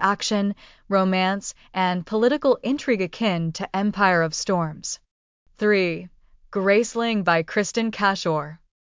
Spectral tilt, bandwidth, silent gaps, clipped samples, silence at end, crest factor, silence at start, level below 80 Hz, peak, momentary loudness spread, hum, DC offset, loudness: -4.5 dB/octave; 7.6 kHz; 5.11-5.46 s; under 0.1%; 0.35 s; 18 dB; 0 s; -60 dBFS; -6 dBFS; 10 LU; none; under 0.1%; -22 LUFS